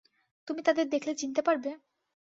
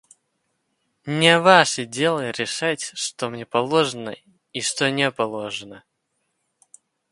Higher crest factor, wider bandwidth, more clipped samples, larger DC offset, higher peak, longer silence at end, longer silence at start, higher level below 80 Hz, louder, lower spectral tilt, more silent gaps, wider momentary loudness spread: about the same, 18 dB vs 22 dB; second, 7.8 kHz vs 11.5 kHz; neither; neither; second, -14 dBFS vs 0 dBFS; second, 0.5 s vs 1.35 s; second, 0.45 s vs 1.05 s; second, -80 dBFS vs -68 dBFS; second, -30 LUFS vs -20 LUFS; about the same, -2.5 dB/octave vs -3.5 dB/octave; neither; second, 12 LU vs 18 LU